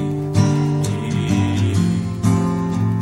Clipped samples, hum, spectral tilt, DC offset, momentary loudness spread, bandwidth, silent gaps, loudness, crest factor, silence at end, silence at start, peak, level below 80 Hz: under 0.1%; none; -7 dB/octave; under 0.1%; 3 LU; 13 kHz; none; -19 LUFS; 14 dB; 0 s; 0 s; -4 dBFS; -44 dBFS